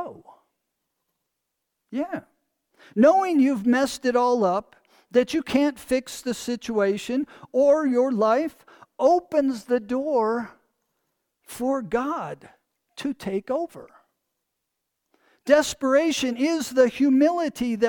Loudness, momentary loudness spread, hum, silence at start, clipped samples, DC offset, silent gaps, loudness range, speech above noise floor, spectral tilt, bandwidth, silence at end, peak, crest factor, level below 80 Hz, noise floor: -23 LUFS; 13 LU; none; 0 s; under 0.1%; under 0.1%; none; 8 LU; 58 dB; -4.5 dB/octave; 19 kHz; 0 s; -6 dBFS; 18 dB; -62 dBFS; -81 dBFS